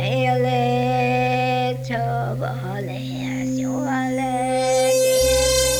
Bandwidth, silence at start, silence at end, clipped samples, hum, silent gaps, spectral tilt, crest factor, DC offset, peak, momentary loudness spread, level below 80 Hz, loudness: 19 kHz; 0 s; 0 s; under 0.1%; none; none; -4.5 dB/octave; 12 dB; under 0.1%; -8 dBFS; 10 LU; -40 dBFS; -21 LUFS